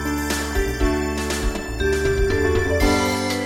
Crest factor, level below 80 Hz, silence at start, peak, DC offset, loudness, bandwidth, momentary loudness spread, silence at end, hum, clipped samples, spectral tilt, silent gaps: 16 dB; -26 dBFS; 0 s; -6 dBFS; under 0.1%; -21 LUFS; 17 kHz; 5 LU; 0 s; none; under 0.1%; -4.5 dB/octave; none